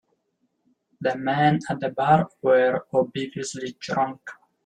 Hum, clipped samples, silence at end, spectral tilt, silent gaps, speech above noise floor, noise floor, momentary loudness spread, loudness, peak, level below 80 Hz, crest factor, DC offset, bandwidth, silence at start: none; under 0.1%; 0.3 s; -6 dB/octave; none; 50 dB; -73 dBFS; 11 LU; -23 LUFS; -6 dBFS; -64 dBFS; 18 dB; under 0.1%; 10 kHz; 1 s